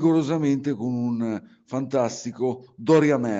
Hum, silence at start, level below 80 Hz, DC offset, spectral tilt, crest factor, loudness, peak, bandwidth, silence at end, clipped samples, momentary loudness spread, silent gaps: none; 0 s; -68 dBFS; under 0.1%; -7 dB/octave; 16 dB; -24 LUFS; -8 dBFS; 8 kHz; 0 s; under 0.1%; 12 LU; none